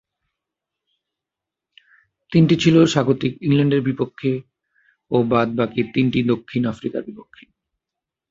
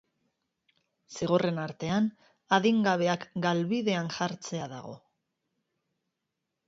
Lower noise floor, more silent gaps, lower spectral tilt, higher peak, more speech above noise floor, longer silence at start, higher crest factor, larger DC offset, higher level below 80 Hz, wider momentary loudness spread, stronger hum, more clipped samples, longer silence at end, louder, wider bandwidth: about the same, -86 dBFS vs -84 dBFS; neither; first, -7 dB/octave vs -5.5 dB/octave; first, 0 dBFS vs -10 dBFS; first, 68 dB vs 56 dB; first, 2.3 s vs 1.1 s; about the same, 20 dB vs 22 dB; neither; first, -56 dBFS vs -68 dBFS; about the same, 11 LU vs 12 LU; neither; neither; second, 1.1 s vs 1.7 s; first, -19 LUFS vs -29 LUFS; about the same, 7.8 kHz vs 7.8 kHz